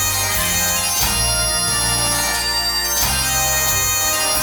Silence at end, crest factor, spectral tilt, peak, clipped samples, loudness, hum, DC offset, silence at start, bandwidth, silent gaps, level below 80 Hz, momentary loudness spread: 0 s; 16 dB; -1 dB/octave; -2 dBFS; under 0.1%; -15 LUFS; none; under 0.1%; 0 s; 19 kHz; none; -32 dBFS; 2 LU